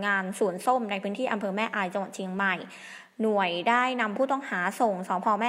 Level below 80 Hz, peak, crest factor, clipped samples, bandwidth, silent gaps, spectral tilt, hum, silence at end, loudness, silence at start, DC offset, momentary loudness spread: -82 dBFS; -10 dBFS; 18 dB; under 0.1%; 16 kHz; none; -4.5 dB/octave; none; 0 s; -27 LUFS; 0 s; under 0.1%; 9 LU